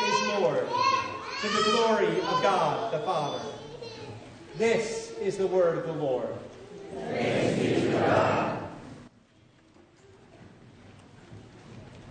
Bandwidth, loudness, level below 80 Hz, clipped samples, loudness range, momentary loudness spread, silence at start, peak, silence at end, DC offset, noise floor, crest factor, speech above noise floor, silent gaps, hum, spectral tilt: 9.6 kHz; -27 LUFS; -62 dBFS; under 0.1%; 4 LU; 21 LU; 0 s; -10 dBFS; 0 s; under 0.1%; -59 dBFS; 18 dB; 33 dB; none; none; -4.5 dB/octave